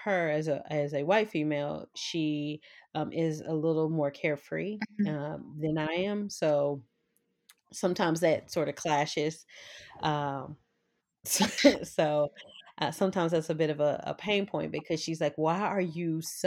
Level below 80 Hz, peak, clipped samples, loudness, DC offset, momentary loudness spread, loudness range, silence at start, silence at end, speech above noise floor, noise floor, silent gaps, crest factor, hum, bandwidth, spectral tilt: -70 dBFS; -8 dBFS; under 0.1%; -30 LUFS; under 0.1%; 9 LU; 4 LU; 0 s; 0 s; 49 dB; -79 dBFS; none; 24 dB; none; 17.5 kHz; -5 dB/octave